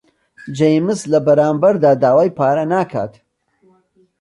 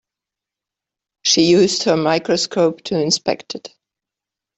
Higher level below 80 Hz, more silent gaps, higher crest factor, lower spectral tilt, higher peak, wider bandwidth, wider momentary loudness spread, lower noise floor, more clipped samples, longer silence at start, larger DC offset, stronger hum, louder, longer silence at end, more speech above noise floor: about the same, -60 dBFS vs -60 dBFS; neither; about the same, 14 dB vs 18 dB; first, -7 dB/octave vs -3.5 dB/octave; about the same, -2 dBFS vs -2 dBFS; first, 11.5 kHz vs 8.4 kHz; about the same, 10 LU vs 12 LU; second, -56 dBFS vs -86 dBFS; neither; second, 0.45 s vs 1.25 s; neither; neither; about the same, -15 LUFS vs -16 LUFS; first, 1.1 s vs 0.9 s; second, 42 dB vs 70 dB